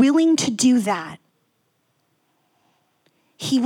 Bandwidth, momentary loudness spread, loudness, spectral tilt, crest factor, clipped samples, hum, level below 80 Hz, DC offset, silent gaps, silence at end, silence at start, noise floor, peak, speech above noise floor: 15 kHz; 14 LU; -19 LUFS; -4 dB/octave; 16 dB; under 0.1%; none; -70 dBFS; under 0.1%; none; 0 s; 0 s; -68 dBFS; -6 dBFS; 50 dB